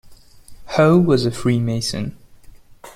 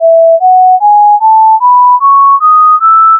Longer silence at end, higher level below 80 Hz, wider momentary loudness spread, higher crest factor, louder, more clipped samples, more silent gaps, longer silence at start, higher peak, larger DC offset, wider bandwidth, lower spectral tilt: about the same, 0.05 s vs 0 s; first, -46 dBFS vs under -90 dBFS; first, 12 LU vs 1 LU; first, 18 dB vs 4 dB; second, -18 LUFS vs -4 LUFS; neither; neither; about the same, 0.05 s vs 0 s; about the same, -2 dBFS vs 0 dBFS; neither; first, 15.5 kHz vs 1.5 kHz; first, -6.5 dB/octave vs -2 dB/octave